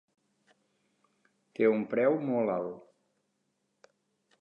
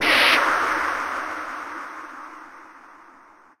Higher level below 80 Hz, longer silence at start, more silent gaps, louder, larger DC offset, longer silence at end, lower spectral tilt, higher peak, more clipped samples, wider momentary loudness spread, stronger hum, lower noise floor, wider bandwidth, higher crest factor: second, -82 dBFS vs -58 dBFS; first, 1.6 s vs 0 s; neither; second, -29 LUFS vs -21 LUFS; neither; first, 1.6 s vs 0.55 s; first, -9 dB/octave vs -1 dB/octave; second, -14 dBFS vs -4 dBFS; neither; second, 16 LU vs 24 LU; neither; first, -79 dBFS vs -51 dBFS; second, 5.4 kHz vs 16 kHz; about the same, 20 dB vs 20 dB